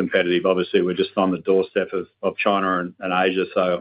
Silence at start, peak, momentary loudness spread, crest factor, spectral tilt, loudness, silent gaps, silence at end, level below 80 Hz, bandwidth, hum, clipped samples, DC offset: 0 s; -4 dBFS; 5 LU; 18 dB; -10 dB/octave; -21 LUFS; none; 0 s; -66 dBFS; 5.2 kHz; none; under 0.1%; under 0.1%